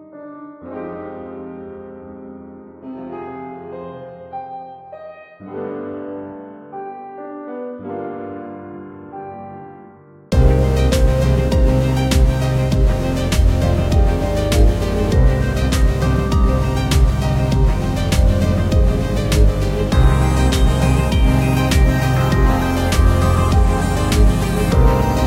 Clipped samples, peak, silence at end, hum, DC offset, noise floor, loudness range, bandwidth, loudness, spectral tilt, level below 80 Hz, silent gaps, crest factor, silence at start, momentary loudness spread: under 0.1%; 0 dBFS; 0 s; none; under 0.1%; -43 dBFS; 16 LU; 15.5 kHz; -16 LUFS; -6.5 dB/octave; -18 dBFS; none; 16 dB; 0 s; 19 LU